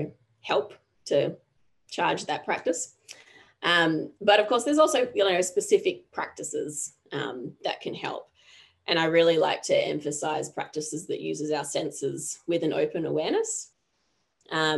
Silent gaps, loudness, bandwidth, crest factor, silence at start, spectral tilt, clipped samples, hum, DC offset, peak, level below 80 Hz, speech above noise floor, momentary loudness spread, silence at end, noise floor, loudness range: none; -27 LUFS; 12.5 kHz; 20 dB; 0 s; -3 dB/octave; under 0.1%; none; under 0.1%; -6 dBFS; -74 dBFS; 48 dB; 13 LU; 0 s; -74 dBFS; 6 LU